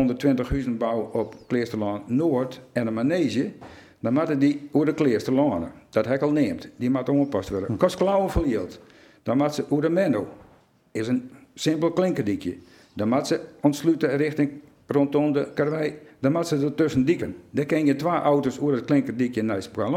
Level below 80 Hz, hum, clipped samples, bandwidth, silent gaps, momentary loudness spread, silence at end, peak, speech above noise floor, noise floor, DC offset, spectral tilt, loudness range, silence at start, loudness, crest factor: -46 dBFS; none; under 0.1%; 15 kHz; none; 7 LU; 0 s; -6 dBFS; 33 dB; -56 dBFS; under 0.1%; -7 dB/octave; 3 LU; 0 s; -24 LUFS; 18 dB